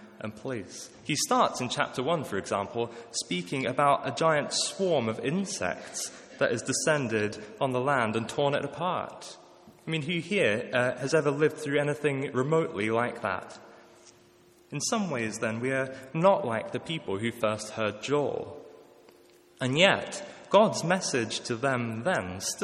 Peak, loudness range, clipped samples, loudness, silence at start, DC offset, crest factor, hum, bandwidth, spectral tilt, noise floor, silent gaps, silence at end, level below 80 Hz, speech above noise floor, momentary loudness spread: -6 dBFS; 4 LU; under 0.1%; -28 LUFS; 0 s; under 0.1%; 24 dB; none; 15.5 kHz; -4 dB/octave; -59 dBFS; none; 0 s; -70 dBFS; 30 dB; 12 LU